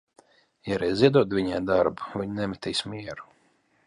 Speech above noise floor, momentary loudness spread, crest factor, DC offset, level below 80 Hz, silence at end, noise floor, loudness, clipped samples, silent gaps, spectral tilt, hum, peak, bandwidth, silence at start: 41 dB; 17 LU; 20 dB; under 0.1%; -54 dBFS; 0.65 s; -66 dBFS; -25 LUFS; under 0.1%; none; -6 dB/octave; none; -6 dBFS; 11.5 kHz; 0.65 s